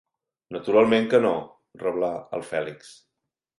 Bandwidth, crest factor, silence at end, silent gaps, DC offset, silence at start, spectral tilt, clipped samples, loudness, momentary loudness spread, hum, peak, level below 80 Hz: 11.5 kHz; 18 dB; 0.7 s; none; under 0.1%; 0.5 s; -6 dB/octave; under 0.1%; -24 LUFS; 18 LU; none; -6 dBFS; -66 dBFS